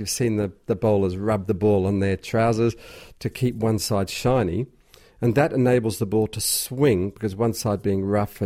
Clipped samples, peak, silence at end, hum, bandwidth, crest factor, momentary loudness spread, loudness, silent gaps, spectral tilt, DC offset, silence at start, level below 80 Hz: under 0.1%; -8 dBFS; 0 s; none; 16 kHz; 16 dB; 6 LU; -23 LUFS; none; -5.5 dB/octave; under 0.1%; 0 s; -48 dBFS